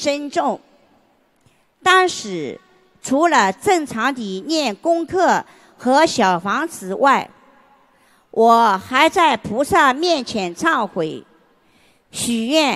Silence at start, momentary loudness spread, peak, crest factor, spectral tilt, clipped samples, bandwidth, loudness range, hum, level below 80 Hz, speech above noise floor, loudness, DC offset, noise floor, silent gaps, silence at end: 0 s; 13 LU; 0 dBFS; 18 dB; -3.5 dB/octave; under 0.1%; 14.5 kHz; 3 LU; none; -58 dBFS; 41 dB; -17 LUFS; under 0.1%; -58 dBFS; none; 0 s